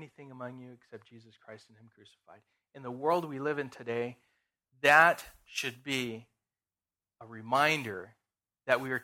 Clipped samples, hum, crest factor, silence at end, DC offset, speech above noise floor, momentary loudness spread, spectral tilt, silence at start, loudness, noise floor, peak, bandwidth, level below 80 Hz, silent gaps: under 0.1%; none; 26 dB; 0 s; under 0.1%; over 58 dB; 24 LU; -4 dB/octave; 0 s; -29 LUFS; under -90 dBFS; -8 dBFS; 17 kHz; -74 dBFS; none